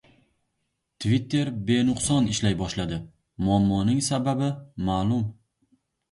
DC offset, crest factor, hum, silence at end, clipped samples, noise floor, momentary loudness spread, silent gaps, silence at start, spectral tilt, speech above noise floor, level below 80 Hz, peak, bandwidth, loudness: under 0.1%; 16 dB; none; 0.8 s; under 0.1%; -77 dBFS; 8 LU; none; 1 s; -5.5 dB/octave; 54 dB; -46 dBFS; -10 dBFS; 11.5 kHz; -25 LUFS